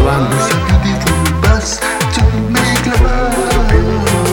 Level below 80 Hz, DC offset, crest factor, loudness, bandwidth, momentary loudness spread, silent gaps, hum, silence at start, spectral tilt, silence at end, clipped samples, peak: -16 dBFS; under 0.1%; 12 dB; -13 LUFS; 19 kHz; 2 LU; none; none; 0 s; -5 dB/octave; 0 s; under 0.1%; 0 dBFS